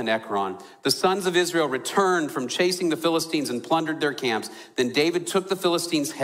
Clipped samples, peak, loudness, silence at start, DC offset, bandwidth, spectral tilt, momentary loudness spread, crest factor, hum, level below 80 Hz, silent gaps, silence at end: under 0.1%; -8 dBFS; -24 LUFS; 0 s; under 0.1%; 16 kHz; -3.5 dB/octave; 6 LU; 16 dB; none; -70 dBFS; none; 0 s